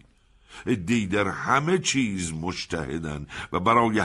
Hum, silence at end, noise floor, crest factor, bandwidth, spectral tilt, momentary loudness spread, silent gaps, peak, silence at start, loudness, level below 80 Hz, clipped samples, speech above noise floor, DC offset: none; 0 s; -58 dBFS; 18 dB; 12 kHz; -4.5 dB/octave; 11 LU; none; -6 dBFS; 0.5 s; -25 LUFS; -50 dBFS; under 0.1%; 33 dB; under 0.1%